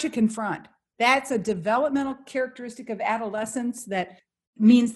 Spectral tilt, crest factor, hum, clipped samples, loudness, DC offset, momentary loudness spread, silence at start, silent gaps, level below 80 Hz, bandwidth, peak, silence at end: -5 dB/octave; 18 dB; none; under 0.1%; -25 LUFS; under 0.1%; 11 LU; 0 s; 4.47-4.53 s; -64 dBFS; 12.5 kHz; -6 dBFS; 0 s